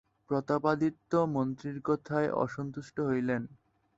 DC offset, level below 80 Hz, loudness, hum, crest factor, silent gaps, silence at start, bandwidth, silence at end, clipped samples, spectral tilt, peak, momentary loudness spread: under 0.1%; -66 dBFS; -32 LUFS; none; 18 dB; none; 0.3 s; 8 kHz; 0.45 s; under 0.1%; -8 dB/octave; -12 dBFS; 7 LU